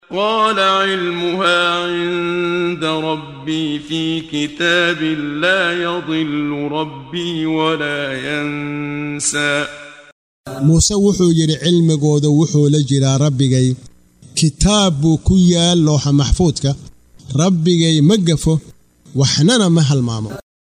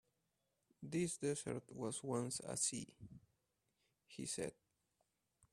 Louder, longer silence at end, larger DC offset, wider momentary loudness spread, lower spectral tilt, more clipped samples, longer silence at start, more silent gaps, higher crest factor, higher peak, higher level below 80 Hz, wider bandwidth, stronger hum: first, -15 LUFS vs -43 LUFS; second, 0.25 s vs 1 s; neither; second, 10 LU vs 18 LU; about the same, -5 dB/octave vs -4 dB/octave; neither; second, 0.1 s vs 0.8 s; first, 10.12-10.44 s vs none; second, 14 dB vs 20 dB; first, 0 dBFS vs -26 dBFS; first, -34 dBFS vs -78 dBFS; second, 11.5 kHz vs 15 kHz; neither